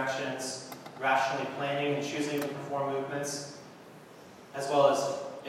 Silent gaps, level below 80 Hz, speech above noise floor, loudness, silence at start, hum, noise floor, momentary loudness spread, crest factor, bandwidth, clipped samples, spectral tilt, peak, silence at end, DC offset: none; -80 dBFS; 21 dB; -31 LUFS; 0 s; none; -51 dBFS; 24 LU; 22 dB; 16 kHz; under 0.1%; -4 dB/octave; -10 dBFS; 0 s; under 0.1%